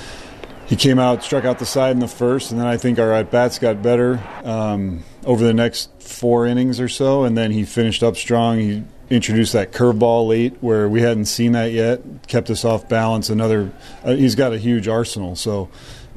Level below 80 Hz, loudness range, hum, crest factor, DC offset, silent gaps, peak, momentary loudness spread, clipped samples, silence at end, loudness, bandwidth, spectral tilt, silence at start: -44 dBFS; 2 LU; none; 16 dB; under 0.1%; none; -2 dBFS; 9 LU; under 0.1%; 0 s; -18 LUFS; 13.5 kHz; -5.5 dB/octave; 0 s